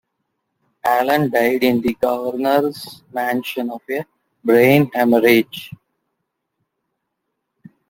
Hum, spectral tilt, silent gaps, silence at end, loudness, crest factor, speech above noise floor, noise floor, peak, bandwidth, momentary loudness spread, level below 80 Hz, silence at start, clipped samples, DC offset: none; -6 dB/octave; none; 2.2 s; -17 LUFS; 18 dB; 59 dB; -76 dBFS; -2 dBFS; 17 kHz; 15 LU; -58 dBFS; 0.85 s; under 0.1%; under 0.1%